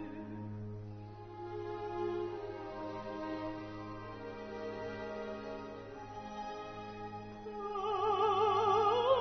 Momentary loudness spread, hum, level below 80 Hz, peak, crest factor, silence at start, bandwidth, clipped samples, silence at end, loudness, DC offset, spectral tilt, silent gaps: 17 LU; none; -62 dBFS; -18 dBFS; 20 dB; 0 s; 6.4 kHz; under 0.1%; 0 s; -38 LUFS; under 0.1%; -4 dB/octave; none